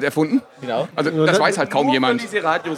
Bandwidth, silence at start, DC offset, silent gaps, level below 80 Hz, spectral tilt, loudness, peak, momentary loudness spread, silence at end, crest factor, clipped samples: 15 kHz; 0 s; under 0.1%; none; -74 dBFS; -5 dB/octave; -19 LUFS; -2 dBFS; 7 LU; 0 s; 16 dB; under 0.1%